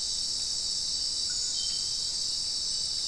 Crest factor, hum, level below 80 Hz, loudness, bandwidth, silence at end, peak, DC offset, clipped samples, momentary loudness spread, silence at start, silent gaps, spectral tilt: 14 dB; none; -54 dBFS; -28 LUFS; 12 kHz; 0 s; -18 dBFS; 0.2%; under 0.1%; 1 LU; 0 s; none; 1.5 dB/octave